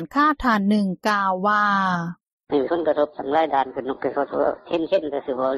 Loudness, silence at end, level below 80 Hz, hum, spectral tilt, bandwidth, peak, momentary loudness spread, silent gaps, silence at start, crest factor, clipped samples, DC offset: -22 LUFS; 0 s; -52 dBFS; none; -6.5 dB/octave; 13 kHz; -8 dBFS; 7 LU; 2.32-2.38 s; 0 s; 14 dB; under 0.1%; under 0.1%